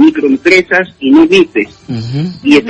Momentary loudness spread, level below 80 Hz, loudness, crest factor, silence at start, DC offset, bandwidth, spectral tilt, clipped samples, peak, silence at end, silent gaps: 12 LU; -46 dBFS; -9 LUFS; 8 dB; 0 s; under 0.1%; 8.6 kHz; -6 dB/octave; 0.6%; 0 dBFS; 0 s; none